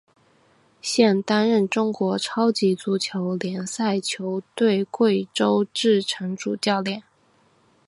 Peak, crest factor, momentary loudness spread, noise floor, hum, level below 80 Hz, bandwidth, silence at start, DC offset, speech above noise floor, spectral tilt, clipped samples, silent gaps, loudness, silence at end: -4 dBFS; 18 dB; 8 LU; -61 dBFS; none; -72 dBFS; 11.5 kHz; 0.85 s; under 0.1%; 39 dB; -5 dB/octave; under 0.1%; none; -22 LUFS; 0.9 s